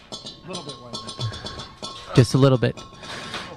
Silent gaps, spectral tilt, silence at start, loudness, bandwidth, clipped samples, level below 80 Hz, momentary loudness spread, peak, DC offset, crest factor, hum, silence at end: none; -6 dB/octave; 0.1 s; -23 LUFS; 12.5 kHz; under 0.1%; -48 dBFS; 18 LU; -4 dBFS; under 0.1%; 20 dB; none; 0 s